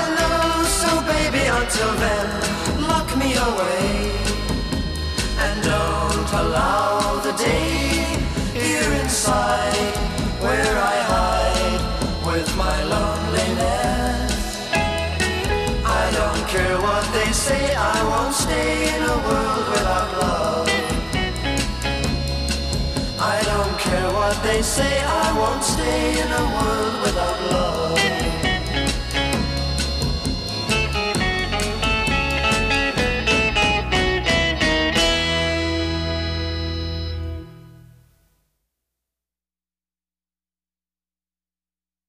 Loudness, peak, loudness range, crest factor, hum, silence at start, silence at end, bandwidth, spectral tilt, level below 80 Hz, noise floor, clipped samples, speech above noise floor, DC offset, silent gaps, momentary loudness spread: -20 LUFS; -4 dBFS; 3 LU; 16 dB; none; 0 s; 4.4 s; 15.5 kHz; -4 dB/octave; -28 dBFS; under -90 dBFS; under 0.1%; over 70 dB; under 0.1%; none; 5 LU